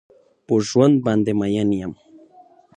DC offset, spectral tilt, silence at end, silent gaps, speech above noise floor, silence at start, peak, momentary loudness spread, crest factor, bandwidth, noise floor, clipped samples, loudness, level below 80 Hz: under 0.1%; -7 dB/octave; 0.85 s; none; 32 dB; 0.5 s; -2 dBFS; 8 LU; 18 dB; 9.8 kHz; -50 dBFS; under 0.1%; -19 LUFS; -54 dBFS